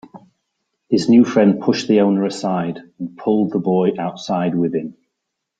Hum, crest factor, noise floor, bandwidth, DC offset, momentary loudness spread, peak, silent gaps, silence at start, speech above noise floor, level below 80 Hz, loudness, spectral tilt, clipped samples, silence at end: none; 16 dB; -78 dBFS; 9 kHz; under 0.1%; 13 LU; -2 dBFS; none; 0.15 s; 61 dB; -60 dBFS; -17 LUFS; -7 dB/octave; under 0.1%; 0.65 s